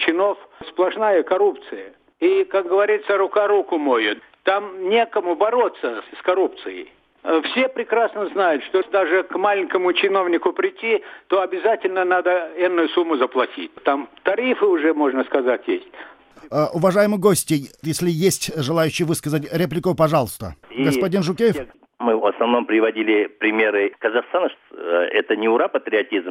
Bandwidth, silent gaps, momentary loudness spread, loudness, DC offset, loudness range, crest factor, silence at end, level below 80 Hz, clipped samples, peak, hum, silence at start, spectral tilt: 16 kHz; none; 7 LU; -20 LUFS; under 0.1%; 2 LU; 16 dB; 0 s; -58 dBFS; under 0.1%; -4 dBFS; none; 0 s; -5 dB/octave